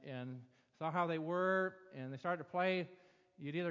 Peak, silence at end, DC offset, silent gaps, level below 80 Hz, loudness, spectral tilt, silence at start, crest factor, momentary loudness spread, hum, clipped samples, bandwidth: -22 dBFS; 0 s; under 0.1%; none; -88 dBFS; -39 LUFS; -7.5 dB/octave; 0 s; 18 dB; 15 LU; none; under 0.1%; 7.4 kHz